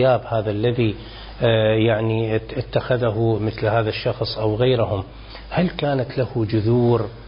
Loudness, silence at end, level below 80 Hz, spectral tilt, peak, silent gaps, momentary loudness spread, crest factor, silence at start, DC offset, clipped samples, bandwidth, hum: -21 LUFS; 0 s; -40 dBFS; -12 dB/octave; -6 dBFS; none; 7 LU; 14 dB; 0 s; under 0.1%; under 0.1%; 5.4 kHz; none